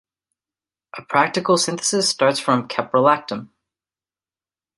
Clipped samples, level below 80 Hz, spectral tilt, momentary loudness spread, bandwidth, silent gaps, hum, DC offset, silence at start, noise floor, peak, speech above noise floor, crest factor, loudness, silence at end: under 0.1%; -68 dBFS; -3 dB/octave; 14 LU; 11.5 kHz; none; none; under 0.1%; 0.95 s; under -90 dBFS; -2 dBFS; over 71 dB; 20 dB; -19 LUFS; 1.3 s